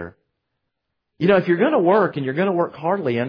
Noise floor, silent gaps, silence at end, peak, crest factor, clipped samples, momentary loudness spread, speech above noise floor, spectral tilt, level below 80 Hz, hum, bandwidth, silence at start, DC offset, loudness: -77 dBFS; none; 0 s; -4 dBFS; 16 dB; under 0.1%; 6 LU; 59 dB; -9.5 dB/octave; -60 dBFS; none; 5.2 kHz; 0 s; under 0.1%; -19 LUFS